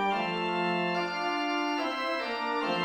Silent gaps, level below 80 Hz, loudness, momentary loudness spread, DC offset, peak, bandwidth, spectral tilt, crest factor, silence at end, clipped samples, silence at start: none; -70 dBFS; -30 LUFS; 2 LU; under 0.1%; -16 dBFS; 16.5 kHz; -5 dB/octave; 12 dB; 0 s; under 0.1%; 0 s